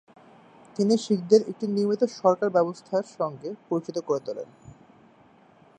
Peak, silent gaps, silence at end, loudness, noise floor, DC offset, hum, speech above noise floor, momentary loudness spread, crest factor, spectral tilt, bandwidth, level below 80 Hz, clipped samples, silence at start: -6 dBFS; none; 1.1 s; -25 LUFS; -56 dBFS; under 0.1%; none; 31 dB; 15 LU; 22 dB; -6.5 dB/octave; 9.6 kHz; -72 dBFS; under 0.1%; 0.8 s